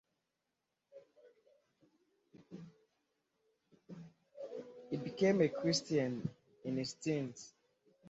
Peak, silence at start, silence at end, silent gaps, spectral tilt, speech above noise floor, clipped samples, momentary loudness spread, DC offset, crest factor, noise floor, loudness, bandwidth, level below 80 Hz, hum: -18 dBFS; 0.95 s; 0 s; none; -5.5 dB/octave; 52 dB; under 0.1%; 23 LU; under 0.1%; 22 dB; -88 dBFS; -37 LUFS; 8 kHz; -78 dBFS; none